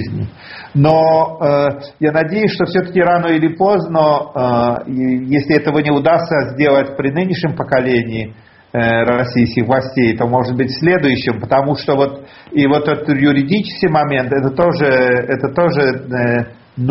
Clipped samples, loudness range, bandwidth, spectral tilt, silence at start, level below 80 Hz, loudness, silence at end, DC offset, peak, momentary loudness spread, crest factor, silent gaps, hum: under 0.1%; 1 LU; 6 kHz; -5.5 dB/octave; 0 s; -46 dBFS; -14 LUFS; 0 s; under 0.1%; 0 dBFS; 6 LU; 14 dB; none; none